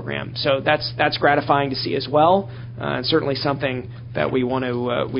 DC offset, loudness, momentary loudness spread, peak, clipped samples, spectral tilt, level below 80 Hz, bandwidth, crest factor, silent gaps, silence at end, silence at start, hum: under 0.1%; -21 LUFS; 9 LU; 0 dBFS; under 0.1%; -10 dB/octave; -48 dBFS; 5.6 kHz; 20 dB; none; 0 s; 0 s; none